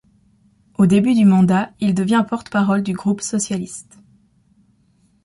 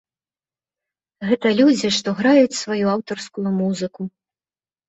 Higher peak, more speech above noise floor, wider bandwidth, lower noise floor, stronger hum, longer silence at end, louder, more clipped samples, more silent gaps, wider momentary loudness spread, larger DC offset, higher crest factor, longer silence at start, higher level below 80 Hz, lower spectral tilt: about the same, -4 dBFS vs -4 dBFS; second, 42 dB vs over 72 dB; first, 11.5 kHz vs 8.2 kHz; second, -59 dBFS vs under -90 dBFS; neither; first, 1.45 s vs 0.8 s; about the same, -17 LUFS vs -19 LUFS; neither; neither; about the same, 12 LU vs 14 LU; neither; about the same, 14 dB vs 18 dB; second, 0.8 s vs 1.2 s; first, -54 dBFS vs -64 dBFS; about the same, -6 dB/octave vs -5 dB/octave